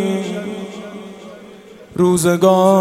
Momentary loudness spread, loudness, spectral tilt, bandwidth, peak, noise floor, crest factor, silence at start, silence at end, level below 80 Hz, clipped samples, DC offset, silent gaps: 23 LU; -15 LUFS; -6 dB/octave; 16.5 kHz; -2 dBFS; -39 dBFS; 16 dB; 0 s; 0 s; -56 dBFS; under 0.1%; under 0.1%; none